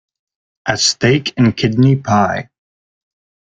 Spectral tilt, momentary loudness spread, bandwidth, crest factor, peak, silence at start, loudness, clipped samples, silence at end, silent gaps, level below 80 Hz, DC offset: -5 dB/octave; 9 LU; 9.2 kHz; 16 dB; 0 dBFS; 0.65 s; -14 LUFS; under 0.1%; 1.05 s; none; -48 dBFS; under 0.1%